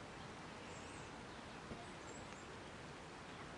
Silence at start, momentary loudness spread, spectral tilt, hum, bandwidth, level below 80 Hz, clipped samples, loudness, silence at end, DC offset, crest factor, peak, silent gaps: 0 s; 1 LU; -4 dB/octave; none; 11 kHz; -68 dBFS; under 0.1%; -52 LUFS; 0 s; under 0.1%; 16 dB; -36 dBFS; none